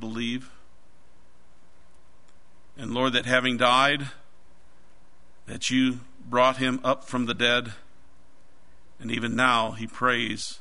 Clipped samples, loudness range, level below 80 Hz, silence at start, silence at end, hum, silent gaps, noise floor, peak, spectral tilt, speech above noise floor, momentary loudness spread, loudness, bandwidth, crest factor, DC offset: under 0.1%; 3 LU; -60 dBFS; 0 s; 0.05 s; none; none; -61 dBFS; -4 dBFS; -4 dB/octave; 36 dB; 15 LU; -24 LUFS; 11 kHz; 24 dB; 1%